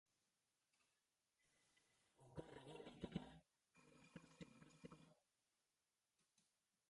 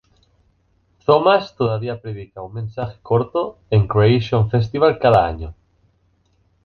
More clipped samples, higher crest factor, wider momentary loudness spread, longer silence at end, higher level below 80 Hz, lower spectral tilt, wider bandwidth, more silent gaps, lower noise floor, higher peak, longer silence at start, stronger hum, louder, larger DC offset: neither; first, 28 dB vs 18 dB; second, 12 LU vs 16 LU; second, 0.45 s vs 1.15 s; second, -80 dBFS vs -42 dBFS; second, -6 dB/octave vs -8.5 dB/octave; first, 11 kHz vs 6.4 kHz; neither; first, under -90 dBFS vs -61 dBFS; second, -36 dBFS vs 0 dBFS; second, 0.8 s vs 1.1 s; neither; second, -60 LUFS vs -18 LUFS; neither